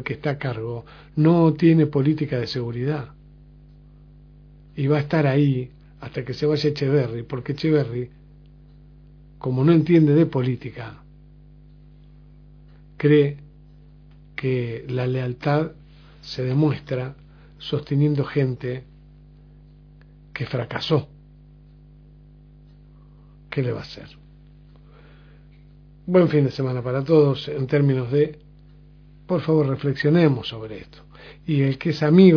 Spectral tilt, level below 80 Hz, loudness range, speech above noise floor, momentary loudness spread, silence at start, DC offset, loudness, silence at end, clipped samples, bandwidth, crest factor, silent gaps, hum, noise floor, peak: -9 dB/octave; -50 dBFS; 9 LU; 28 dB; 18 LU; 0 s; under 0.1%; -22 LUFS; 0 s; under 0.1%; 5.4 kHz; 20 dB; none; 50 Hz at -45 dBFS; -48 dBFS; -2 dBFS